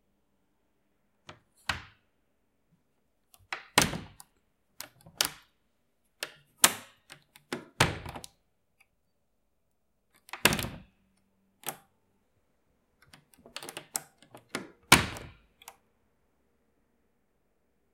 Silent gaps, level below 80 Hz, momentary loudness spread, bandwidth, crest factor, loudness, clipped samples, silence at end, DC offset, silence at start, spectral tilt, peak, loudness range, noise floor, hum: none; -56 dBFS; 23 LU; 16.5 kHz; 34 dB; -29 LUFS; under 0.1%; 2.25 s; under 0.1%; 1.3 s; -2 dB/octave; -2 dBFS; 13 LU; -79 dBFS; none